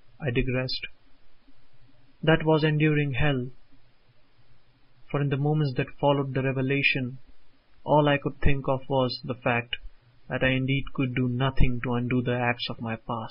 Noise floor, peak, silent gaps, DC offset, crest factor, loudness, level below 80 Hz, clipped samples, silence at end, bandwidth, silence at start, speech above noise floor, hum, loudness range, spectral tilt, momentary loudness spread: -54 dBFS; -4 dBFS; none; under 0.1%; 22 dB; -26 LUFS; -38 dBFS; under 0.1%; 0 s; 5.6 kHz; 0.05 s; 30 dB; none; 3 LU; -11 dB/octave; 10 LU